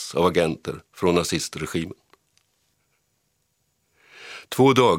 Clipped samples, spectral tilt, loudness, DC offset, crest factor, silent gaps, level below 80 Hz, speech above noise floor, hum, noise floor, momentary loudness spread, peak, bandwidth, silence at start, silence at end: under 0.1%; -5 dB/octave; -23 LUFS; under 0.1%; 22 dB; none; -54 dBFS; 50 dB; none; -71 dBFS; 19 LU; -2 dBFS; 17 kHz; 0 s; 0 s